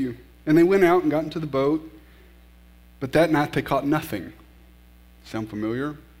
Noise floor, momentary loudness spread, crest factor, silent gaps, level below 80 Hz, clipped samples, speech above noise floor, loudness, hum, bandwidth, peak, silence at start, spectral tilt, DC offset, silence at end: -51 dBFS; 16 LU; 18 dB; none; -50 dBFS; under 0.1%; 29 dB; -23 LUFS; 60 Hz at -50 dBFS; 16 kHz; -6 dBFS; 0 s; -7 dB/octave; under 0.1%; 0.25 s